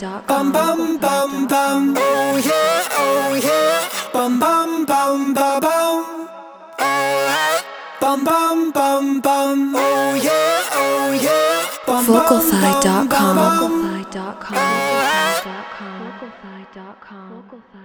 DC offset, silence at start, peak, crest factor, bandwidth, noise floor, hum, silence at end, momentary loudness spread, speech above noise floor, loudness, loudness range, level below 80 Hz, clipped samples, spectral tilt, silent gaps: under 0.1%; 0 s; 0 dBFS; 18 dB; over 20 kHz; -40 dBFS; none; 0 s; 15 LU; 24 dB; -17 LUFS; 4 LU; -58 dBFS; under 0.1%; -3.5 dB/octave; none